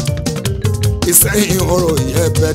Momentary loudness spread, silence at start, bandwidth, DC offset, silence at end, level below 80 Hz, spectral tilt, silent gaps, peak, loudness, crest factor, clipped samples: 9 LU; 0 s; 16.5 kHz; under 0.1%; 0 s; -26 dBFS; -4.5 dB/octave; none; 0 dBFS; -13 LUFS; 14 dB; under 0.1%